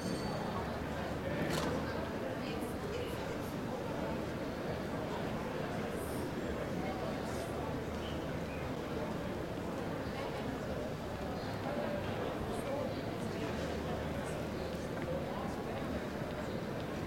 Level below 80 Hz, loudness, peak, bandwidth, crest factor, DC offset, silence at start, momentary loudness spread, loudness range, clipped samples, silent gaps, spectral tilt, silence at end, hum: -54 dBFS; -39 LUFS; -22 dBFS; 16.5 kHz; 16 dB; under 0.1%; 0 s; 2 LU; 1 LU; under 0.1%; none; -6 dB/octave; 0 s; none